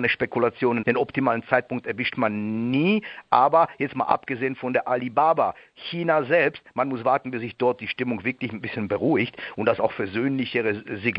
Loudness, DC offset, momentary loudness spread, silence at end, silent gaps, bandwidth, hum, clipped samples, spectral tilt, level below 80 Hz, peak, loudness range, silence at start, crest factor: -24 LUFS; under 0.1%; 8 LU; 0 s; none; 5.6 kHz; none; under 0.1%; -9 dB/octave; -64 dBFS; -2 dBFS; 3 LU; 0 s; 22 dB